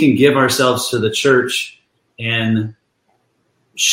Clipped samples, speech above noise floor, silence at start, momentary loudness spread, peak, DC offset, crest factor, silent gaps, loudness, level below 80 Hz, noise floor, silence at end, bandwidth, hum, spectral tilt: under 0.1%; 49 dB; 0 s; 14 LU; 0 dBFS; under 0.1%; 16 dB; none; -15 LUFS; -58 dBFS; -64 dBFS; 0 s; 16.5 kHz; none; -4 dB/octave